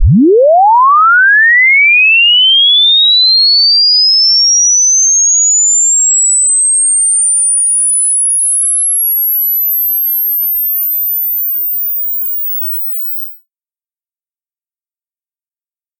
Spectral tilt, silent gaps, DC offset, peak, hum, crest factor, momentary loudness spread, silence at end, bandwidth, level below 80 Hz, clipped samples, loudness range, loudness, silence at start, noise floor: -0.5 dB/octave; none; under 0.1%; -2 dBFS; none; 8 dB; 8 LU; 2.65 s; 17 kHz; -32 dBFS; under 0.1%; 11 LU; -6 LUFS; 0 s; under -90 dBFS